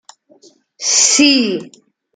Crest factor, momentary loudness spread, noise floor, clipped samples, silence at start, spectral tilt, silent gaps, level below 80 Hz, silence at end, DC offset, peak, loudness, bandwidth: 16 dB; 12 LU; -49 dBFS; under 0.1%; 0.8 s; -0.5 dB/octave; none; -66 dBFS; 0.45 s; under 0.1%; 0 dBFS; -11 LUFS; 10.5 kHz